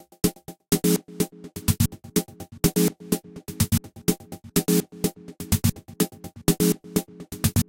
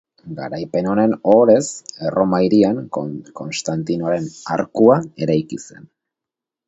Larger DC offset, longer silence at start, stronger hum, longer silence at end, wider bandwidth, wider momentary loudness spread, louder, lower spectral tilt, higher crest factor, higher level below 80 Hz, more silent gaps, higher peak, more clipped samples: neither; about the same, 0.25 s vs 0.25 s; neither; second, 0.05 s vs 1 s; first, 17 kHz vs 8.2 kHz; second, 8 LU vs 15 LU; second, -25 LUFS vs -18 LUFS; about the same, -5 dB/octave vs -6 dB/octave; about the same, 22 dB vs 18 dB; first, -42 dBFS vs -56 dBFS; neither; second, -4 dBFS vs 0 dBFS; neither